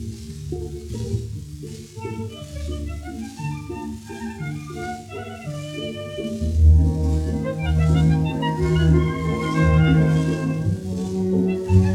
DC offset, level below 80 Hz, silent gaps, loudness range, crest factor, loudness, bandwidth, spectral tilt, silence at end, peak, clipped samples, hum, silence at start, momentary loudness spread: under 0.1%; -30 dBFS; none; 12 LU; 18 dB; -22 LUFS; 12 kHz; -7.5 dB/octave; 0 s; -4 dBFS; under 0.1%; none; 0 s; 16 LU